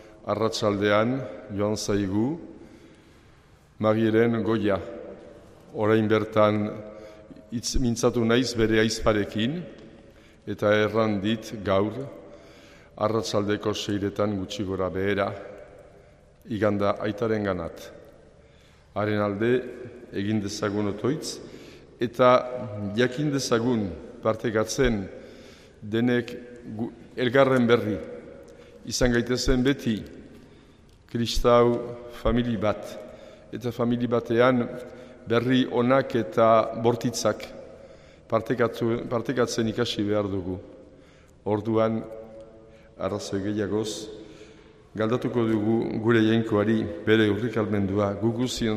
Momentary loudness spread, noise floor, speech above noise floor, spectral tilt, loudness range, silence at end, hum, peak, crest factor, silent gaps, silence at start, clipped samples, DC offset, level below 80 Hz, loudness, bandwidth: 19 LU; -55 dBFS; 30 dB; -5.5 dB/octave; 5 LU; 0 s; none; -6 dBFS; 20 dB; none; 0 s; under 0.1%; under 0.1%; -44 dBFS; -25 LUFS; 15 kHz